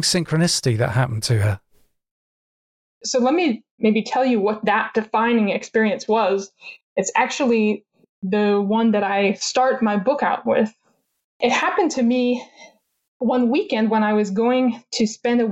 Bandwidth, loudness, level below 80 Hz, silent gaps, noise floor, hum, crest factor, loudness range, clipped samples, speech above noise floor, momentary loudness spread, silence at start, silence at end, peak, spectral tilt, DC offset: 13.5 kHz; -20 LUFS; -60 dBFS; 2.11-3.01 s, 3.71-3.78 s, 6.83-6.96 s, 8.09-8.22 s, 11.24-11.40 s, 13.08-13.20 s; under -90 dBFS; none; 14 dB; 3 LU; under 0.1%; over 71 dB; 6 LU; 0 s; 0 s; -6 dBFS; -5 dB/octave; under 0.1%